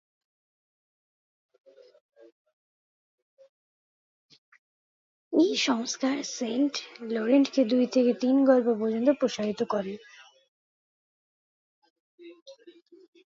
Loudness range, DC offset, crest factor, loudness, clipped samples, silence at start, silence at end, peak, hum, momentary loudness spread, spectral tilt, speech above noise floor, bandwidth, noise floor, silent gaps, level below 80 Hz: 10 LU; under 0.1%; 20 dB; -26 LUFS; under 0.1%; 5.3 s; 0.65 s; -8 dBFS; none; 9 LU; -4 dB/octave; 29 dB; 7.6 kHz; -54 dBFS; 10.48-11.82 s, 11.90-12.18 s, 12.42-12.46 s; -80 dBFS